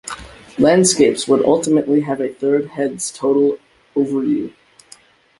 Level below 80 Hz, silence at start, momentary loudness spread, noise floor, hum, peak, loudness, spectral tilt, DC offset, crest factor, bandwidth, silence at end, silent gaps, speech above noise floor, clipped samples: -54 dBFS; 0.05 s; 16 LU; -48 dBFS; none; -2 dBFS; -16 LUFS; -4.5 dB/octave; under 0.1%; 16 dB; 11.5 kHz; 0.9 s; none; 32 dB; under 0.1%